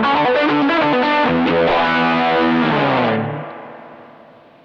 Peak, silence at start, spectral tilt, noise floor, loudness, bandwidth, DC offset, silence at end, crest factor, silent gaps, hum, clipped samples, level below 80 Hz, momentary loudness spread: -4 dBFS; 0 s; -7 dB/octave; -44 dBFS; -15 LUFS; 7.2 kHz; under 0.1%; 0.6 s; 12 dB; none; none; under 0.1%; -50 dBFS; 12 LU